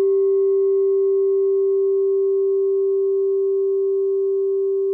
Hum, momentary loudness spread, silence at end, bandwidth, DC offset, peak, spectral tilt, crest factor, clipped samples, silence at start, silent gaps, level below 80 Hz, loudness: none; 3 LU; 0 s; 1.2 kHz; under 0.1%; -14 dBFS; -9 dB/octave; 4 dB; under 0.1%; 0 s; none; under -90 dBFS; -19 LUFS